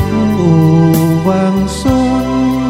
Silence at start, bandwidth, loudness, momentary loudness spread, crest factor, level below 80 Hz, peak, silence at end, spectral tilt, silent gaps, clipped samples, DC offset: 0 s; 16 kHz; -11 LUFS; 5 LU; 10 dB; -30 dBFS; 0 dBFS; 0 s; -7.5 dB/octave; none; under 0.1%; under 0.1%